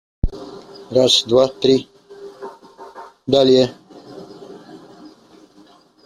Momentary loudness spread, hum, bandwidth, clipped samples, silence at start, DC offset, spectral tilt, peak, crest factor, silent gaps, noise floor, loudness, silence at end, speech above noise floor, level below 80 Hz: 26 LU; none; 13 kHz; under 0.1%; 0.25 s; under 0.1%; -4.5 dB/octave; -2 dBFS; 18 dB; none; -49 dBFS; -16 LUFS; 1.3 s; 35 dB; -36 dBFS